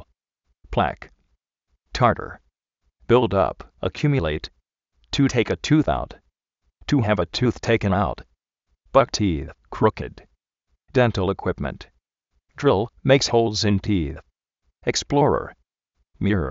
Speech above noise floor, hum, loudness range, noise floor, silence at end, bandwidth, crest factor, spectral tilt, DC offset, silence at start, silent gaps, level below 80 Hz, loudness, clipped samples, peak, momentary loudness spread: 52 dB; none; 3 LU; -73 dBFS; 0 s; 7.6 kHz; 22 dB; -5 dB/octave; under 0.1%; 0.7 s; none; -42 dBFS; -22 LUFS; under 0.1%; -2 dBFS; 15 LU